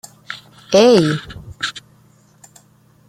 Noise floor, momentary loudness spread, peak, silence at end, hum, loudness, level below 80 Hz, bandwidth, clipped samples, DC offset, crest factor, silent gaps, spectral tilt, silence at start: -52 dBFS; 23 LU; -2 dBFS; 1.3 s; none; -15 LUFS; -52 dBFS; 15 kHz; under 0.1%; under 0.1%; 18 dB; none; -5 dB/octave; 0.3 s